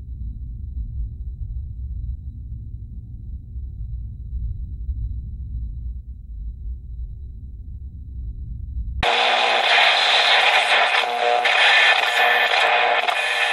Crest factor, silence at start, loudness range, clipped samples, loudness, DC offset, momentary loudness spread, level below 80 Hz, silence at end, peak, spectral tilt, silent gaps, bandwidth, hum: 18 dB; 0 s; 19 LU; under 0.1%; -16 LUFS; under 0.1%; 22 LU; -32 dBFS; 0 s; -2 dBFS; -2.5 dB/octave; none; 14.5 kHz; none